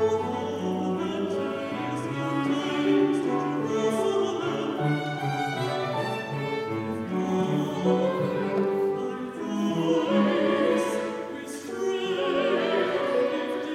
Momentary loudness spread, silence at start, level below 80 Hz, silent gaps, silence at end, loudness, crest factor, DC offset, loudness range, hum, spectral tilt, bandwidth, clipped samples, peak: 7 LU; 0 s; -72 dBFS; none; 0 s; -27 LUFS; 16 dB; under 0.1%; 2 LU; none; -6 dB/octave; 15 kHz; under 0.1%; -10 dBFS